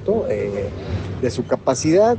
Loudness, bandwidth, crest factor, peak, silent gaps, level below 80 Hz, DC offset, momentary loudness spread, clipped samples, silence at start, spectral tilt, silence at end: -21 LUFS; 9.2 kHz; 14 dB; -4 dBFS; none; -40 dBFS; under 0.1%; 10 LU; under 0.1%; 0 s; -6 dB/octave; 0 s